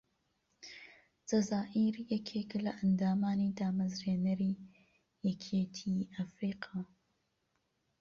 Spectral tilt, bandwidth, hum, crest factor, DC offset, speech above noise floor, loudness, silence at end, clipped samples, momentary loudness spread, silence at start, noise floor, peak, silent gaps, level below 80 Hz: -6.5 dB/octave; 7.4 kHz; none; 16 dB; under 0.1%; 46 dB; -36 LUFS; 1.15 s; under 0.1%; 18 LU; 0.65 s; -80 dBFS; -22 dBFS; none; -70 dBFS